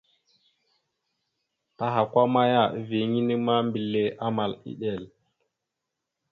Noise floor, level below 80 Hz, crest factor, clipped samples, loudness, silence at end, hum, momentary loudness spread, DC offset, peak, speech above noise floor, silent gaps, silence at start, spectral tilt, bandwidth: -84 dBFS; -68 dBFS; 20 dB; under 0.1%; -25 LUFS; 1.25 s; none; 11 LU; under 0.1%; -8 dBFS; 59 dB; none; 1.8 s; -9 dB/octave; 5 kHz